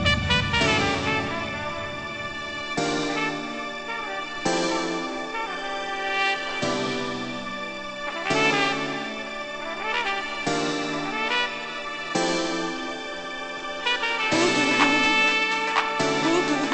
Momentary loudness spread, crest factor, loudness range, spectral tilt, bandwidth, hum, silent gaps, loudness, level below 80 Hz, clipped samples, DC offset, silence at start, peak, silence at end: 11 LU; 20 dB; 6 LU; -3.5 dB/octave; 8.4 kHz; none; none; -24 LUFS; -46 dBFS; under 0.1%; under 0.1%; 0 s; -6 dBFS; 0 s